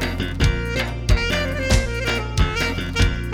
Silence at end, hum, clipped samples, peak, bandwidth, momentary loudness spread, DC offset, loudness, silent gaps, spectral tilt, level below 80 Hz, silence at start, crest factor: 0 s; none; under 0.1%; -2 dBFS; 16.5 kHz; 3 LU; under 0.1%; -21 LUFS; none; -4.5 dB/octave; -24 dBFS; 0 s; 18 dB